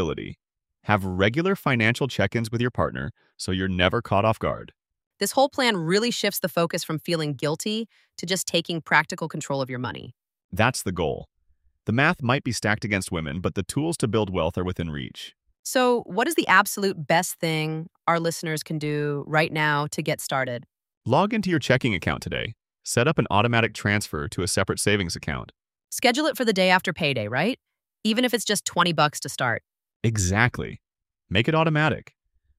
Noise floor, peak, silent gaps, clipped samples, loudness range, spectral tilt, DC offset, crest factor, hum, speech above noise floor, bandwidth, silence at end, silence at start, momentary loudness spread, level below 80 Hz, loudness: -65 dBFS; -4 dBFS; 5.07-5.11 s, 10.44-10.49 s, 15.59-15.63 s, 20.97-21.01 s, 29.96-30.00 s; under 0.1%; 3 LU; -4.5 dB/octave; under 0.1%; 22 dB; none; 41 dB; 16 kHz; 0.55 s; 0 s; 11 LU; -50 dBFS; -24 LUFS